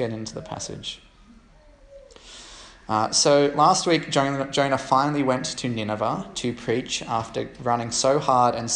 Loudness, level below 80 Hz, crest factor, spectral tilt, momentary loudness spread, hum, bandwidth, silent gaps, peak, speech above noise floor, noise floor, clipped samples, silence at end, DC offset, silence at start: -23 LUFS; -54 dBFS; 20 dB; -3.5 dB/octave; 16 LU; none; 11 kHz; none; -4 dBFS; 29 dB; -52 dBFS; under 0.1%; 0 s; under 0.1%; 0 s